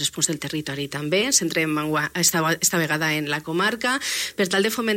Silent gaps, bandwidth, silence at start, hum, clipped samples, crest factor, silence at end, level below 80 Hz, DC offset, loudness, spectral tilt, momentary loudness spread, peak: none; 16.5 kHz; 0 s; none; under 0.1%; 18 dB; 0 s; -60 dBFS; under 0.1%; -22 LUFS; -2.5 dB/octave; 7 LU; -4 dBFS